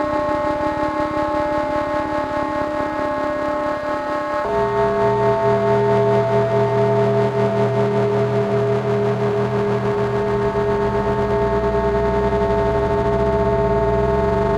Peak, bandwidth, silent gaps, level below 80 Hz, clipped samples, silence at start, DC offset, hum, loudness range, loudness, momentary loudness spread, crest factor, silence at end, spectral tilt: -6 dBFS; 10 kHz; none; -34 dBFS; under 0.1%; 0 s; under 0.1%; none; 4 LU; -19 LUFS; 5 LU; 14 dB; 0 s; -8 dB/octave